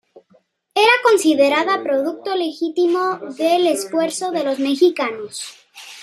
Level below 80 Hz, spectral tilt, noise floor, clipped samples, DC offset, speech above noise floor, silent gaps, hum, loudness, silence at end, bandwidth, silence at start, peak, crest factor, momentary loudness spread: -74 dBFS; -2.5 dB/octave; -58 dBFS; under 0.1%; under 0.1%; 40 dB; none; none; -18 LUFS; 0 s; 14 kHz; 0.15 s; 0 dBFS; 18 dB; 10 LU